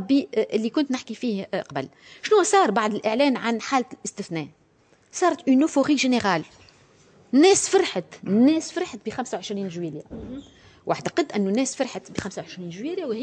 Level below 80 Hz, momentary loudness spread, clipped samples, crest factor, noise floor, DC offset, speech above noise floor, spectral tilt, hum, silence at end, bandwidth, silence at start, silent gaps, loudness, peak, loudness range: -62 dBFS; 15 LU; under 0.1%; 18 dB; -60 dBFS; under 0.1%; 37 dB; -4 dB/octave; none; 0 s; 9.8 kHz; 0 s; none; -23 LUFS; -6 dBFS; 7 LU